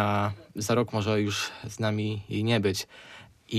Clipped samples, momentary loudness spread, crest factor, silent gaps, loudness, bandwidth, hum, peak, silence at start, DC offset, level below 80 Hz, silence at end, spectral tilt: under 0.1%; 14 LU; 16 dB; none; -28 LUFS; 15 kHz; none; -12 dBFS; 0 s; under 0.1%; -62 dBFS; 0 s; -5 dB/octave